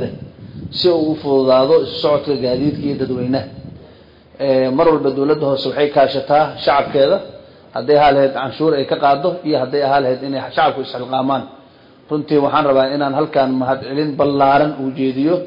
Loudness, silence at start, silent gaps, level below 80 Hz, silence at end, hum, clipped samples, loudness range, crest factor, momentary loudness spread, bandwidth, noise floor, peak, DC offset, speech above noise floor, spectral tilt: -16 LUFS; 0 s; none; -52 dBFS; 0 s; none; under 0.1%; 3 LU; 14 dB; 10 LU; 5.4 kHz; -45 dBFS; -2 dBFS; under 0.1%; 30 dB; -8.5 dB/octave